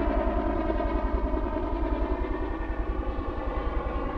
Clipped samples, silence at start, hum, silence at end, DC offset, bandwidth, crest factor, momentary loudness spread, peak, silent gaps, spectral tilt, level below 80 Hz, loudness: under 0.1%; 0 s; none; 0 s; 0.2%; 5 kHz; 14 dB; 5 LU; -14 dBFS; none; -9.5 dB/octave; -30 dBFS; -30 LUFS